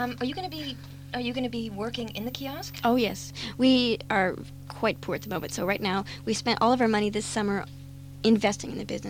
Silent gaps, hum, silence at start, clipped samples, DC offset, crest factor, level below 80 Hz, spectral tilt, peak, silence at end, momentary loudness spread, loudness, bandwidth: none; none; 0 s; under 0.1%; under 0.1%; 18 dB; -54 dBFS; -4.5 dB/octave; -10 dBFS; 0 s; 13 LU; -28 LUFS; 16 kHz